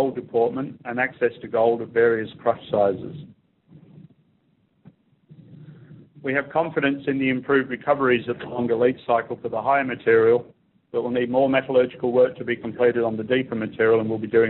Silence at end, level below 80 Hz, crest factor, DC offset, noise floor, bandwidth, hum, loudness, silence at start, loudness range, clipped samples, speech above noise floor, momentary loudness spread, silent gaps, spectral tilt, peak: 0 s; -62 dBFS; 16 dB; under 0.1%; -65 dBFS; 4.2 kHz; none; -22 LUFS; 0 s; 8 LU; under 0.1%; 43 dB; 8 LU; none; -4.5 dB/octave; -6 dBFS